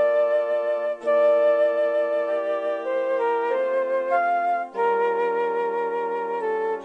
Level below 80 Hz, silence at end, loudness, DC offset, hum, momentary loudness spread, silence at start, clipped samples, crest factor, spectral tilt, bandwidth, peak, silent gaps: -74 dBFS; 0 s; -23 LUFS; under 0.1%; none; 6 LU; 0 s; under 0.1%; 12 dB; -5 dB/octave; 5.8 kHz; -12 dBFS; none